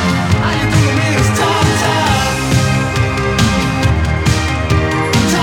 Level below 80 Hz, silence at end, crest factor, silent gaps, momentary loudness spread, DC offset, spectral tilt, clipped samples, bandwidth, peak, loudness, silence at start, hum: -24 dBFS; 0 s; 12 dB; none; 2 LU; under 0.1%; -5 dB/octave; under 0.1%; 17.5 kHz; 0 dBFS; -13 LUFS; 0 s; none